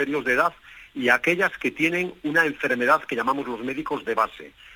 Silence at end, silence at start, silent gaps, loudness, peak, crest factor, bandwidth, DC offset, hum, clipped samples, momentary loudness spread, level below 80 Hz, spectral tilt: 0 s; 0 s; none; -23 LUFS; -4 dBFS; 20 dB; 19 kHz; under 0.1%; none; under 0.1%; 9 LU; -60 dBFS; -4.5 dB/octave